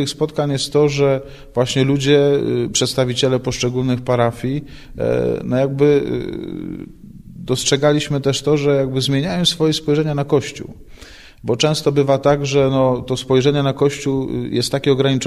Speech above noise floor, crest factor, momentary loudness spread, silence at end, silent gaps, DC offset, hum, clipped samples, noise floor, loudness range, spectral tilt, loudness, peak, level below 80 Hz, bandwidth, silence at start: 23 dB; 16 dB; 10 LU; 0 s; none; under 0.1%; none; under 0.1%; -40 dBFS; 2 LU; -5 dB/octave; -17 LUFS; -2 dBFS; -42 dBFS; 13 kHz; 0 s